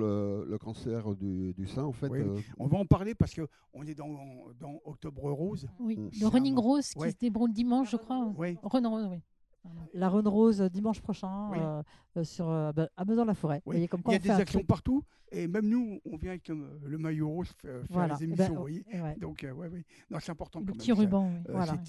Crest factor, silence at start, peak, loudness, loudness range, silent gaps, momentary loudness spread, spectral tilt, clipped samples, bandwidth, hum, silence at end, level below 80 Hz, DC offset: 24 dB; 0 s; -8 dBFS; -32 LUFS; 5 LU; none; 15 LU; -7.5 dB/octave; under 0.1%; 12 kHz; none; 0 s; -52 dBFS; under 0.1%